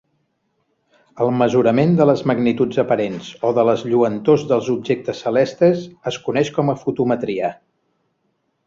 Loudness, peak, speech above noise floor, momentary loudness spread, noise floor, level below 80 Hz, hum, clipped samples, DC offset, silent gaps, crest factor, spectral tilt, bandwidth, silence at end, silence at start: -18 LUFS; -2 dBFS; 51 dB; 8 LU; -69 dBFS; -58 dBFS; none; under 0.1%; under 0.1%; none; 16 dB; -7 dB/octave; 7.6 kHz; 1.15 s; 1.15 s